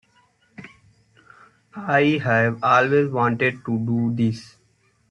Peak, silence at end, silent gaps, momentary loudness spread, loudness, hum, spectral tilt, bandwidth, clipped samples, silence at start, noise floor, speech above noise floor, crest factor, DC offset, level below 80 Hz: -4 dBFS; 0.65 s; none; 10 LU; -20 LUFS; none; -7.5 dB/octave; 9 kHz; under 0.1%; 0.6 s; -63 dBFS; 43 dB; 18 dB; under 0.1%; -62 dBFS